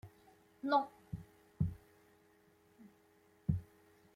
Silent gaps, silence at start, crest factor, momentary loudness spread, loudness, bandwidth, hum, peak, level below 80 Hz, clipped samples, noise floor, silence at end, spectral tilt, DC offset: none; 0.05 s; 22 dB; 23 LU; -40 LUFS; 15.5 kHz; none; -20 dBFS; -60 dBFS; under 0.1%; -69 dBFS; 0.5 s; -8.5 dB/octave; under 0.1%